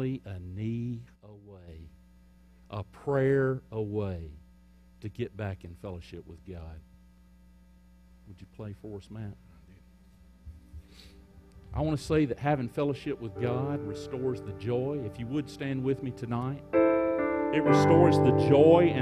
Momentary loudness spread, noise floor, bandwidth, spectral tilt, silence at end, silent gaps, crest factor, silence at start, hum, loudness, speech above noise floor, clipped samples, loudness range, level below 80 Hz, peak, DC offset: 23 LU; -57 dBFS; 12.5 kHz; -8 dB/octave; 0 s; none; 22 dB; 0 s; none; -28 LUFS; 29 dB; under 0.1%; 21 LU; -54 dBFS; -8 dBFS; under 0.1%